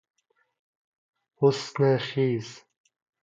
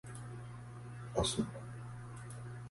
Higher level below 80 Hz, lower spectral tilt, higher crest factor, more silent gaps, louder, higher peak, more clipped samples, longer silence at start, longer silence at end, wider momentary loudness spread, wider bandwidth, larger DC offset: second, -72 dBFS vs -56 dBFS; first, -6.5 dB/octave vs -4.5 dB/octave; about the same, 22 dB vs 24 dB; neither; first, -25 LUFS vs -42 LUFS; first, -8 dBFS vs -18 dBFS; neither; first, 1.4 s vs 0.05 s; first, 0.65 s vs 0 s; second, 7 LU vs 14 LU; second, 7.8 kHz vs 11.5 kHz; neither